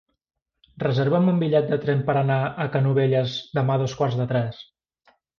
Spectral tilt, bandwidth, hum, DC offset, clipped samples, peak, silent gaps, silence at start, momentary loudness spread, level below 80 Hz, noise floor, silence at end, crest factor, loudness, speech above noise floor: -8 dB/octave; 6.8 kHz; none; under 0.1%; under 0.1%; -8 dBFS; none; 0.75 s; 6 LU; -60 dBFS; -81 dBFS; 0.75 s; 14 dB; -23 LUFS; 59 dB